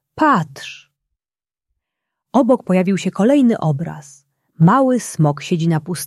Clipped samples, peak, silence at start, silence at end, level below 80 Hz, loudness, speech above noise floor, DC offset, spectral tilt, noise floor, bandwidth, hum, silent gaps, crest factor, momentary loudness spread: under 0.1%; -2 dBFS; 0.15 s; 0 s; -60 dBFS; -16 LUFS; over 74 dB; under 0.1%; -7 dB/octave; under -90 dBFS; 12.5 kHz; none; none; 16 dB; 15 LU